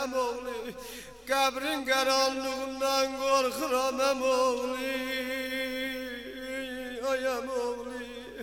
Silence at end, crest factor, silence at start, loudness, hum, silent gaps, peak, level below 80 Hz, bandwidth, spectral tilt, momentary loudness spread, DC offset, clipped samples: 0 s; 18 dB; 0 s; -30 LUFS; 50 Hz at -60 dBFS; none; -14 dBFS; -60 dBFS; 18 kHz; -1.5 dB/octave; 12 LU; under 0.1%; under 0.1%